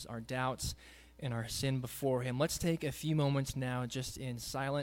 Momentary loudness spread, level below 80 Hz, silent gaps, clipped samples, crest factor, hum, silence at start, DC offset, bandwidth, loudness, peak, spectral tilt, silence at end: 8 LU; -56 dBFS; none; under 0.1%; 16 dB; none; 0 s; under 0.1%; 17 kHz; -36 LUFS; -20 dBFS; -5 dB/octave; 0 s